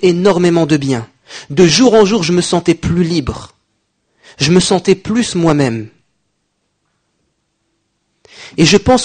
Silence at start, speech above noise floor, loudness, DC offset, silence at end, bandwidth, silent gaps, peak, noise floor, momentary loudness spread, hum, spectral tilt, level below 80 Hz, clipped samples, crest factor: 0 s; 55 dB; -12 LUFS; under 0.1%; 0 s; 9.6 kHz; none; 0 dBFS; -67 dBFS; 16 LU; none; -5 dB/octave; -38 dBFS; under 0.1%; 14 dB